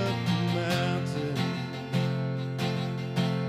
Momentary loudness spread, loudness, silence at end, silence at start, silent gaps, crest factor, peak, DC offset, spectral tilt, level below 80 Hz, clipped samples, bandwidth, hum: 4 LU; -29 LUFS; 0 s; 0 s; none; 14 dB; -14 dBFS; under 0.1%; -6.5 dB/octave; -68 dBFS; under 0.1%; 15 kHz; none